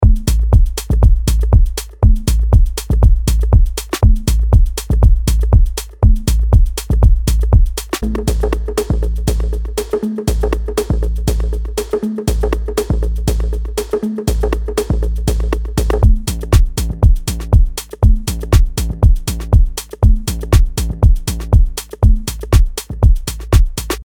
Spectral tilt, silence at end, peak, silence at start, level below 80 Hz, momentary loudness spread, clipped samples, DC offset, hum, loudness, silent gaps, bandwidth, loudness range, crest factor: -6 dB/octave; 0 s; 0 dBFS; 0 s; -14 dBFS; 6 LU; under 0.1%; under 0.1%; none; -16 LUFS; none; 18 kHz; 4 LU; 12 dB